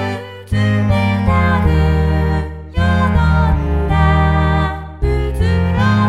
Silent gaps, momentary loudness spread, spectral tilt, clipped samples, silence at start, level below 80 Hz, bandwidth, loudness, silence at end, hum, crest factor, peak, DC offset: none; 8 LU; -8 dB/octave; under 0.1%; 0 s; -20 dBFS; 9.8 kHz; -15 LUFS; 0 s; none; 12 dB; -2 dBFS; 0.2%